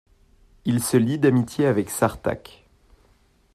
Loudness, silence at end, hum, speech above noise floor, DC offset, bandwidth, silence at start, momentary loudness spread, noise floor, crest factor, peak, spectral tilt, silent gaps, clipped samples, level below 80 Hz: -22 LUFS; 1.15 s; none; 38 dB; under 0.1%; 15 kHz; 0.65 s; 10 LU; -60 dBFS; 18 dB; -6 dBFS; -6 dB/octave; none; under 0.1%; -54 dBFS